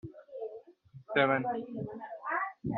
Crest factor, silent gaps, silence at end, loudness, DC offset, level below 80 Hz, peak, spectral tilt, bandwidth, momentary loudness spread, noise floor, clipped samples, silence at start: 22 dB; none; 0 s; -33 LUFS; under 0.1%; -68 dBFS; -12 dBFS; -4 dB/octave; 4.4 kHz; 16 LU; -55 dBFS; under 0.1%; 0.05 s